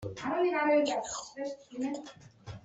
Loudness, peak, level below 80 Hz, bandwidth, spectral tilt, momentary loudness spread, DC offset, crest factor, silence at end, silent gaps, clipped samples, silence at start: -32 LUFS; -16 dBFS; -66 dBFS; 8.2 kHz; -4.5 dB/octave; 21 LU; under 0.1%; 16 dB; 0.05 s; none; under 0.1%; 0 s